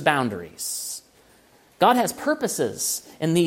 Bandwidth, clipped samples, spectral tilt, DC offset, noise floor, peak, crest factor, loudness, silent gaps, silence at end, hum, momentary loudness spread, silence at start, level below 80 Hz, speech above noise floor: 16.5 kHz; under 0.1%; -3.5 dB/octave; under 0.1%; -56 dBFS; -2 dBFS; 22 dB; -24 LUFS; none; 0 s; none; 11 LU; 0 s; -64 dBFS; 33 dB